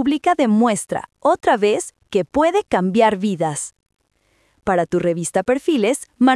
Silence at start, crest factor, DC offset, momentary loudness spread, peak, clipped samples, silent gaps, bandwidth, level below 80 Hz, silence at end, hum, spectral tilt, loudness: 0 s; 16 dB; under 0.1%; 7 LU; -2 dBFS; under 0.1%; none; 12 kHz; -54 dBFS; 0 s; none; -5 dB/octave; -19 LUFS